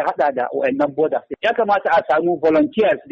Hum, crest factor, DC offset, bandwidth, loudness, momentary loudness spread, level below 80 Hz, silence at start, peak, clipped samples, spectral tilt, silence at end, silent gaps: none; 10 dB; under 0.1%; 7 kHz; -18 LUFS; 5 LU; -58 dBFS; 0 s; -6 dBFS; under 0.1%; -7 dB/octave; 0.1 s; none